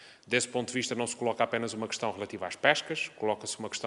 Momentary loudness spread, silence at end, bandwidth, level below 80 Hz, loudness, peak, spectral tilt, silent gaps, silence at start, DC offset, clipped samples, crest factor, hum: 8 LU; 0 s; 11.5 kHz; -74 dBFS; -31 LUFS; -6 dBFS; -3 dB/octave; none; 0 s; under 0.1%; under 0.1%; 26 dB; none